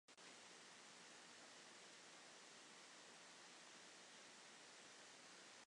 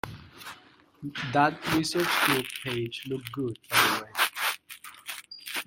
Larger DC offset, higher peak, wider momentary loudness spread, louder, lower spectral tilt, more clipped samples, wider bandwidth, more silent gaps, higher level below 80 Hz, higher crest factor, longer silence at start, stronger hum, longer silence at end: neither; second, -50 dBFS vs -6 dBFS; second, 0 LU vs 19 LU; second, -61 LUFS vs -27 LUFS; second, -0.5 dB/octave vs -3 dB/octave; neither; second, 11 kHz vs 17 kHz; neither; second, under -90 dBFS vs -62 dBFS; second, 14 dB vs 24 dB; about the same, 0.1 s vs 0.05 s; neither; about the same, 0 s vs 0.05 s